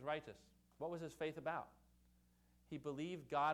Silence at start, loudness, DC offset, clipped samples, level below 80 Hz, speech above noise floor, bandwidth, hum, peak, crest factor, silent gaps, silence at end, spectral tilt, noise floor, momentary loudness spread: 0 s; -47 LUFS; under 0.1%; under 0.1%; -76 dBFS; 29 dB; 18 kHz; 60 Hz at -75 dBFS; -28 dBFS; 18 dB; none; 0 s; -6 dB/octave; -74 dBFS; 14 LU